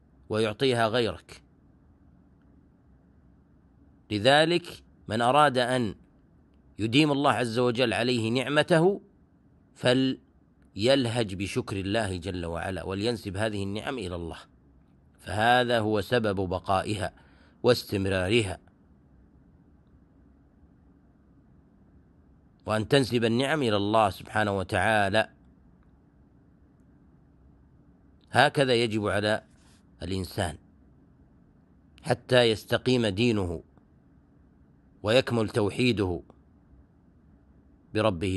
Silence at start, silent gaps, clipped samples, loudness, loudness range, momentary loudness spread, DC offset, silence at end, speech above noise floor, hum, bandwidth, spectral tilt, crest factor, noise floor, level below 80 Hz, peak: 0.3 s; none; under 0.1%; -26 LUFS; 7 LU; 13 LU; under 0.1%; 0 s; 34 dB; none; 12 kHz; -5.5 dB/octave; 24 dB; -60 dBFS; -56 dBFS; -4 dBFS